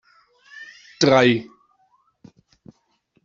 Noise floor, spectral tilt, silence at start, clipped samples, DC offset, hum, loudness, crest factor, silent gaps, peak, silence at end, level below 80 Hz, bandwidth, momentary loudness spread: -66 dBFS; -5 dB/octave; 0.55 s; under 0.1%; under 0.1%; none; -18 LUFS; 22 dB; none; -2 dBFS; 1.85 s; -62 dBFS; 7.8 kHz; 26 LU